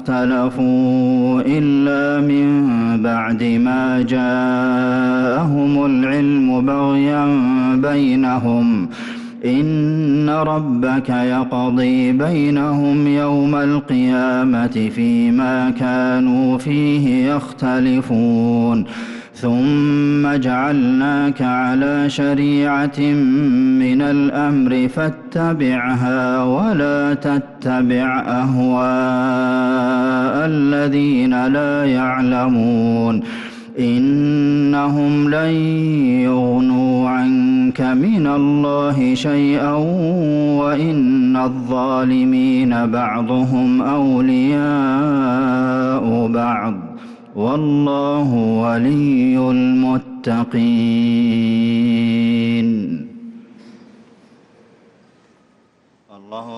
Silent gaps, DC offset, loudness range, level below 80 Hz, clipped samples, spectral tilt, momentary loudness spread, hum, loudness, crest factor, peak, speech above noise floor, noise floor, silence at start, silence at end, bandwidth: none; under 0.1%; 2 LU; -52 dBFS; under 0.1%; -8 dB/octave; 4 LU; none; -16 LUFS; 8 dB; -8 dBFS; 41 dB; -56 dBFS; 0 s; 0 s; 7.8 kHz